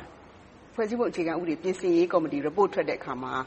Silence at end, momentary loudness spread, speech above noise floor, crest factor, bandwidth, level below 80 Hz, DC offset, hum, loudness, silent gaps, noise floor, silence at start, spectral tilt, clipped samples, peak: 0 s; 8 LU; 24 dB; 18 dB; 8.4 kHz; -62 dBFS; under 0.1%; none; -27 LUFS; none; -51 dBFS; 0 s; -6.5 dB/octave; under 0.1%; -10 dBFS